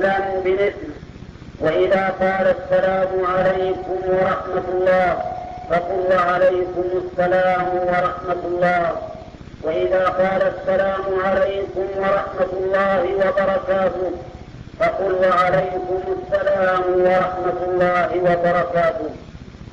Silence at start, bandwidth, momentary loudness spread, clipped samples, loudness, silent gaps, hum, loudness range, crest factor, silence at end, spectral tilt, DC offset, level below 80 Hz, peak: 0 s; 7.4 kHz; 12 LU; under 0.1%; -19 LUFS; none; none; 2 LU; 10 dB; 0 s; -7 dB/octave; under 0.1%; -44 dBFS; -8 dBFS